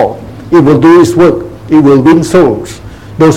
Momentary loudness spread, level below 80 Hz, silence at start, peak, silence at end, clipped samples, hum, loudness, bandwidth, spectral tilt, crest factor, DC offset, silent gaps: 20 LU; -34 dBFS; 0 s; 0 dBFS; 0 s; 4%; none; -6 LUFS; 13.5 kHz; -7 dB/octave; 6 dB; 0.8%; none